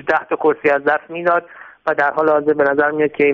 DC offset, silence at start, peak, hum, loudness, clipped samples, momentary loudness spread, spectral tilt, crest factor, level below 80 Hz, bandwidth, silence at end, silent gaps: under 0.1%; 0.05 s; -2 dBFS; none; -17 LUFS; under 0.1%; 4 LU; -4 dB/octave; 14 dB; -60 dBFS; 6 kHz; 0 s; none